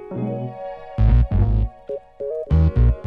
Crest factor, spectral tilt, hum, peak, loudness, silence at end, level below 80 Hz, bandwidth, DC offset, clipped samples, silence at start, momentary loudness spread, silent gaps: 14 dB; -11 dB/octave; none; -4 dBFS; -21 LUFS; 0 s; -22 dBFS; 4.1 kHz; under 0.1%; under 0.1%; 0 s; 14 LU; none